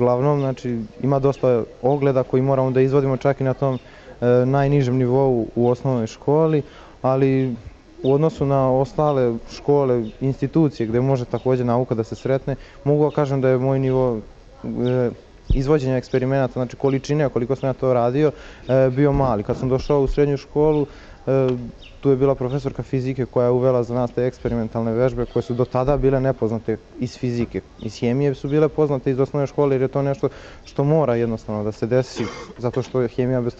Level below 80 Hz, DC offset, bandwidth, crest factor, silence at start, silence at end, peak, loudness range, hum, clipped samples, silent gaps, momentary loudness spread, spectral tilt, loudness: -38 dBFS; under 0.1%; 7.6 kHz; 14 dB; 0 s; 0.05 s; -6 dBFS; 3 LU; none; under 0.1%; none; 8 LU; -8.5 dB/octave; -20 LUFS